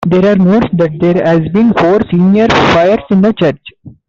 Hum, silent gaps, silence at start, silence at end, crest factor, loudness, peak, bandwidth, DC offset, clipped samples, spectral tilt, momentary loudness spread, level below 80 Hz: none; none; 0 s; 0.15 s; 8 dB; -9 LUFS; -2 dBFS; 7.2 kHz; under 0.1%; under 0.1%; -7.5 dB/octave; 4 LU; -38 dBFS